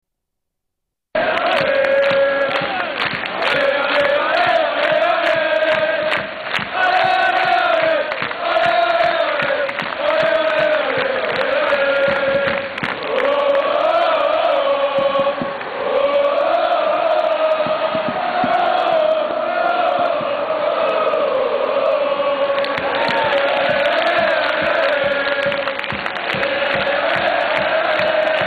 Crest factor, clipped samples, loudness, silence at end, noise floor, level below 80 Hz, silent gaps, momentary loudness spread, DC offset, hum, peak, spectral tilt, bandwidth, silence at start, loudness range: 12 dB; under 0.1%; -17 LUFS; 0 s; -78 dBFS; -54 dBFS; none; 5 LU; under 0.1%; none; -6 dBFS; -5 dB/octave; 9.4 kHz; 1.15 s; 2 LU